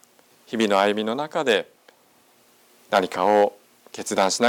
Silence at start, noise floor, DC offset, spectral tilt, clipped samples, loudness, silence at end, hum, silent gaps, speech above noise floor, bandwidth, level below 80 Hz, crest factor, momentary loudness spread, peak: 0.5 s; -58 dBFS; under 0.1%; -3.5 dB/octave; under 0.1%; -22 LUFS; 0 s; none; none; 37 dB; 18.5 kHz; -76 dBFS; 18 dB; 14 LU; -6 dBFS